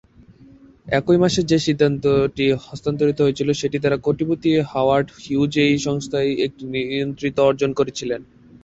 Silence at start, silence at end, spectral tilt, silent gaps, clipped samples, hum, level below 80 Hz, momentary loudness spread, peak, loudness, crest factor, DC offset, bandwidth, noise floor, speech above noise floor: 0.85 s; 0.4 s; -6 dB/octave; none; under 0.1%; none; -50 dBFS; 7 LU; -2 dBFS; -20 LUFS; 16 dB; under 0.1%; 8 kHz; -47 dBFS; 28 dB